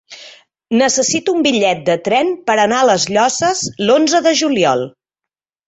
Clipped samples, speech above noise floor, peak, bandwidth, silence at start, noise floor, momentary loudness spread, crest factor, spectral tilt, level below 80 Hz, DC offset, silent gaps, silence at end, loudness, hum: under 0.1%; 71 dB; -2 dBFS; 8.4 kHz; 0.1 s; -85 dBFS; 5 LU; 14 dB; -3 dB/octave; -58 dBFS; under 0.1%; none; 0.8 s; -14 LUFS; none